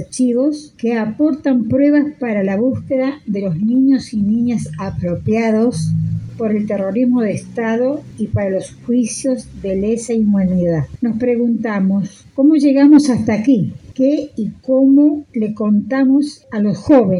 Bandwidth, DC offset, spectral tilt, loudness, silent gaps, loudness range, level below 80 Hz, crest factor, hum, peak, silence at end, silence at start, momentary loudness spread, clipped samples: 11 kHz; under 0.1%; -7 dB/octave; -16 LUFS; none; 5 LU; -44 dBFS; 14 dB; none; 0 dBFS; 0 s; 0 s; 10 LU; under 0.1%